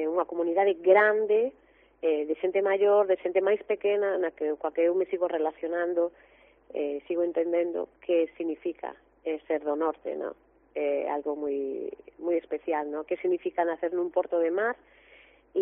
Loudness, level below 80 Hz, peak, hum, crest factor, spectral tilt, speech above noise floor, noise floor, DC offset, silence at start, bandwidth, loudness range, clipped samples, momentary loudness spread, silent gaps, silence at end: -28 LUFS; -70 dBFS; -8 dBFS; none; 20 dB; -3 dB/octave; 30 dB; -57 dBFS; under 0.1%; 0 s; 3.7 kHz; 7 LU; under 0.1%; 12 LU; none; 0 s